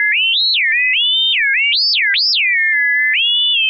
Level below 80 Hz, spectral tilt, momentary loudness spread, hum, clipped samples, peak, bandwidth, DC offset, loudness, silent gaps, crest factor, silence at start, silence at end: under -90 dBFS; 7 dB/octave; 1 LU; none; under 0.1%; -6 dBFS; 6.2 kHz; under 0.1%; -11 LUFS; none; 8 dB; 0 s; 0 s